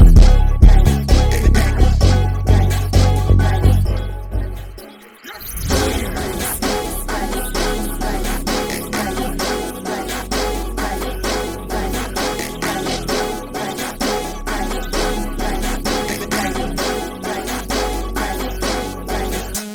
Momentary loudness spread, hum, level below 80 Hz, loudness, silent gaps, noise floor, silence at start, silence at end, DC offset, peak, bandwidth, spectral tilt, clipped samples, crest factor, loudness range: 9 LU; none; -18 dBFS; -19 LUFS; none; -38 dBFS; 0 s; 0 s; under 0.1%; 0 dBFS; 19.5 kHz; -5 dB/octave; under 0.1%; 16 dB; 7 LU